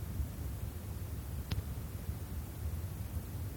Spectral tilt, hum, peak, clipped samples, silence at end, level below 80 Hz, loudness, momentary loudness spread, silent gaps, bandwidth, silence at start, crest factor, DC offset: -6 dB/octave; none; -22 dBFS; under 0.1%; 0 s; -44 dBFS; -42 LUFS; 3 LU; none; over 20 kHz; 0 s; 18 dB; under 0.1%